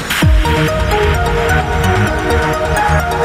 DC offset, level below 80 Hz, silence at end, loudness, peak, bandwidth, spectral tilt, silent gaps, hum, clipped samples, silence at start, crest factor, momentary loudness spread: under 0.1%; -18 dBFS; 0 s; -13 LUFS; 0 dBFS; 16 kHz; -5 dB/octave; none; none; under 0.1%; 0 s; 12 dB; 2 LU